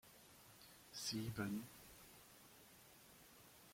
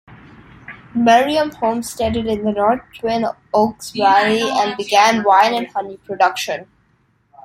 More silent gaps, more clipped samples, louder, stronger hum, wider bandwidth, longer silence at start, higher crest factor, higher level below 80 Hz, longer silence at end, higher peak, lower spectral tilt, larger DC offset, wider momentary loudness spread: neither; neither; second, -48 LUFS vs -17 LUFS; neither; about the same, 16.5 kHz vs 16.5 kHz; about the same, 0.05 s vs 0.1 s; first, 22 dB vs 16 dB; second, -76 dBFS vs -50 dBFS; about the same, 0 s vs 0.05 s; second, -32 dBFS vs 0 dBFS; about the same, -4 dB/octave vs -4 dB/octave; neither; first, 18 LU vs 12 LU